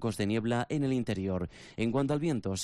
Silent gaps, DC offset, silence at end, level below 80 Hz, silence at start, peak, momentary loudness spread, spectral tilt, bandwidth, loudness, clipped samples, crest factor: none; under 0.1%; 0 s; -58 dBFS; 0 s; -20 dBFS; 5 LU; -6 dB/octave; 13.5 kHz; -32 LUFS; under 0.1%; 10 dB